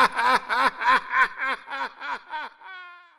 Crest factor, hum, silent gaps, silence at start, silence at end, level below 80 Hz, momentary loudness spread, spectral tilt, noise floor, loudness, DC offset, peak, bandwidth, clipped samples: 20 dB; none; none; 0 s; 0.2 s; -60 dBFS; 19 LU; -1.5 dB/octave; -43 dBFS; -23 LUFS; under 0.1%; -4 dBFS; 14.5 kHz; under 0.1%